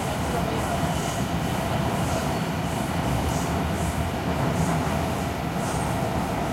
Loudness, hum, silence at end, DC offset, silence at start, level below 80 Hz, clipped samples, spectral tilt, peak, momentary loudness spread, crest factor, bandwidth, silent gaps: -26 LUFS; none; 0 s; under 0.1%; 0 s; -36 dBFS; under 0.1%; -5.5 dB/octave; -12 dBFS; 3 LU; 12 dB; 16 kHz; none